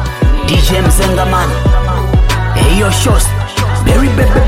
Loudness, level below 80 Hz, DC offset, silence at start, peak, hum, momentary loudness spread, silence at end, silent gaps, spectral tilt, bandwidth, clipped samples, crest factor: -11 LUFS; -12 dBFS; under 0.1%; 0 s; 0 dBFS; none; 3 LU; 0 s; none; -5 dB/octave; 16 kHz; under 0.1%; 8 dB